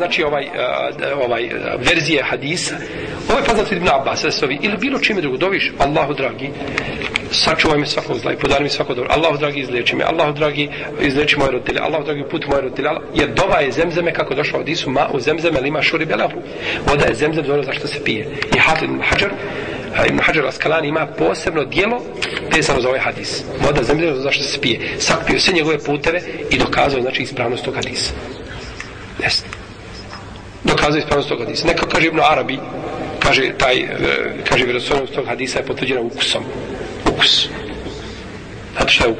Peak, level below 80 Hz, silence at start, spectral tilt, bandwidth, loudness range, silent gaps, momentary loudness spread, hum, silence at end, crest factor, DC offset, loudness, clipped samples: 0 dBFS; -38 dBFS; 0 s; -4 dB/octave; 10 kHz; 2 LU; none; 11 LU; none; 0 s; 18 dB; under 0.1%; -17 LUFS; under 0.1%